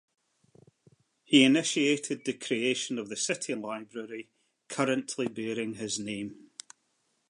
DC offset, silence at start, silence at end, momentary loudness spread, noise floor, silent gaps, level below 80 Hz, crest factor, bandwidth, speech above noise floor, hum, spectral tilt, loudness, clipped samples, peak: under 0.1%; 1.3 s; 0.95 s; 18 LU; -75 dBFS; none; -78 dBFS; 24 dB; 11 kHz; 46 dB; none; -3 dB/octave; -29 LUFS; under 0.1%; -8 dBFS